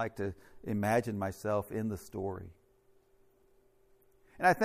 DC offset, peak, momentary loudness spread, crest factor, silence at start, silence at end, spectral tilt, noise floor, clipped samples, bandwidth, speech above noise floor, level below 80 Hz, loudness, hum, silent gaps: under 0.1%; -12 dBFS; 13 LU; 22 dB; 0 s; 0 s; -6.5 dB/octave; -67 dBFS; under 0.1%; 15.5 kHz; 34 dB; -64 dBFS; -34 LUFS; none; none